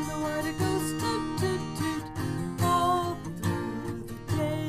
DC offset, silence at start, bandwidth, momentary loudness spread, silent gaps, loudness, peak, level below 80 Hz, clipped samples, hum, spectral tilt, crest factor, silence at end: under 0.1%; 0 s; 15.5 kHz; 8 LU; none; -30 LUFS; -14 dBFS; -50 dBFS; under 0.1%; none; -5.5 dB/octave; 16 dB; 0 s